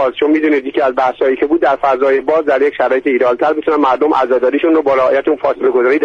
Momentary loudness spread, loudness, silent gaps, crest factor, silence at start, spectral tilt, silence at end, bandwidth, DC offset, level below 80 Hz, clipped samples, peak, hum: 2 LU; -13 LUFS; none; 10 dB; 0 s; -6 dB/octave; 0 s; 7 kHz; under 0.1%; -52 dBFS; under 0.1%; -2 dBFS; none